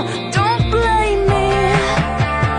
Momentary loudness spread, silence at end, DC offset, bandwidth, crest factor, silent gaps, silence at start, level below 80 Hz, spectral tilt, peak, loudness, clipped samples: 3 LU; 0 s; under 0.1%; 10.5 kHz; 12 dB; none; 0 s; -26 dBFS; -5.5 dB/octave; -2 dBFS; -16 LUFS; under 0.1%